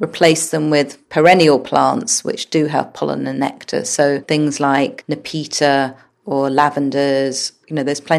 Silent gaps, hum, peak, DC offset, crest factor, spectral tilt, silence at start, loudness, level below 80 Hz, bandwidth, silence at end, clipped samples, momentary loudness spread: none; none; 0 dBFS; under 0.1%; 16 dB; -4 dB/octave; 0 s; -16 LUFS; -62 dBFS; 14 kHz; 0 s; under 0.1%; 10 LU